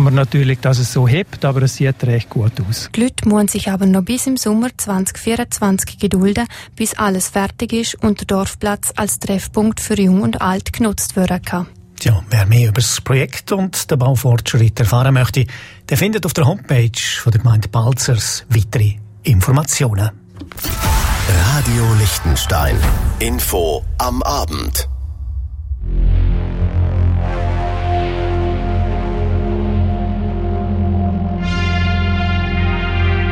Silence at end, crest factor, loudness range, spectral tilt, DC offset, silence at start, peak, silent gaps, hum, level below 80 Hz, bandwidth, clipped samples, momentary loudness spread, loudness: 0 s; 12 dB; 4 LU; -5.5 dB/octave; under 0.1%; 0 s; -2 dBFS; none; none; -24 dBFS; 16.5 kHz; under 0.1%; 6 LU; -16 LUFS